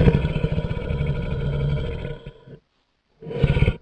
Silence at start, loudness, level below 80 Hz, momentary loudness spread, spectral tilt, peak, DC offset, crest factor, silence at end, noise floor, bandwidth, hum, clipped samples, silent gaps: 0 s; -25 LUFS; -30 dBFS; 15 LU; -9 dB/octave; -4 dBFS; under 0.1%; 20 dB; 0.05 s; -68 dBFS; 5.4 kHz; none; under 0.1%; none